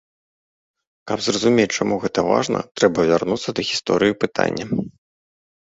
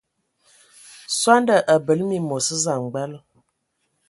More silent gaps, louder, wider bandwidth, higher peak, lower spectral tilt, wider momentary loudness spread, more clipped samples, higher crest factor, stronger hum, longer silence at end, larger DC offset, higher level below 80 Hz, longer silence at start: first, 2.71-2.75 s vs none; about the same, -20 LUFS vs -20 LUFS; second, 8 kHz vs 12 kHz; about the same, -2 dBFS vs 0 dBFS; about the same, -4.5 dB/octave vs -3.5 dB/octave; second, 8 LU vs 13 LU; neither; about the same, 20 dB vs 22 dB; neither; about the same, 0.85 s vs 0.9 s; neither; first, -54 dBFS vs -68 dBFS; about the same, 1.05 s vs 1.1 s